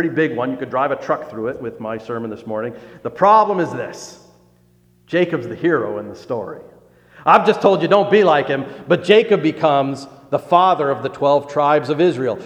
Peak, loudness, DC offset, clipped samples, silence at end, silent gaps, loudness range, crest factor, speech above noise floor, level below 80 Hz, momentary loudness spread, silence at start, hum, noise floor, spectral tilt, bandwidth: 0 dBFS; -17 LUFS; under 0.1%; under 0.1%; 0 s; none; 8 LU; 18 dB; 37 dB; -62 dBFS; 15 LU; 0 s; 60 Hz at -50 dBFS; -54 dBFS; -6.5 dB/octave; 10 kHz